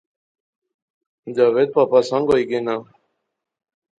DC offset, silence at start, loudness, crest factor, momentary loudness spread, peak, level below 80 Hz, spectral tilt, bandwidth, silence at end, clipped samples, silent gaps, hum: under 0.1%; 1.25 s; -18 LUFS; 20 dB; 11 LU; -2 dBFS; -60 dBFS; -6 dB/octave; 9 kHz; 1.15 s; under 0.1%; none; none